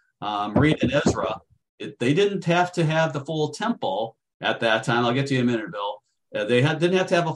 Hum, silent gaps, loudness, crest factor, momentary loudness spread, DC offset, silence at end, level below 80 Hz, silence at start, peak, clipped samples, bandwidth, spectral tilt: none; 1.69-1.78 s, 4.34-4.40 s; -23 LUFS; 16 dB; 11 LU; under 0.1%; 0 s; -52 dBFS; 0.2 s; -6 dBFS; under 0.1%; 11.5 kHz; -6 dB/octave